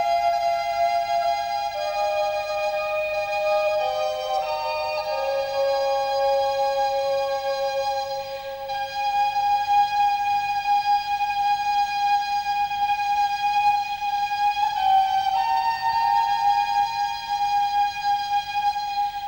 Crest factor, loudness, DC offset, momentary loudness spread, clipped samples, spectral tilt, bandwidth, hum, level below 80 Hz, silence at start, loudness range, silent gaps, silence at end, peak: 12 dB; -23 LUFS; under 0.1%; 5 LU; under 0.1%; -1.5 dB/octave; 16 kHz; none; -56 dBFS; 0 s; 3 LU; none; 0 s; -10 dBFS